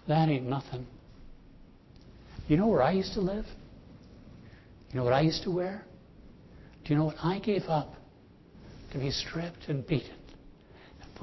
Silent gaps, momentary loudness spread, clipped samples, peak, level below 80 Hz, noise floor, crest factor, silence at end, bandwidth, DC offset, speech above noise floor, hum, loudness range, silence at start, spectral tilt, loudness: none; 26 LU; under 0.1%; -12 dBFS; -52 dBFS; -56 dBFS; 20 dB; 0 s; 6.2 kHz; under 0.1%; 27 dB; none; 4 LU; 0.05 s; -7 dB/octave; -30 LUFS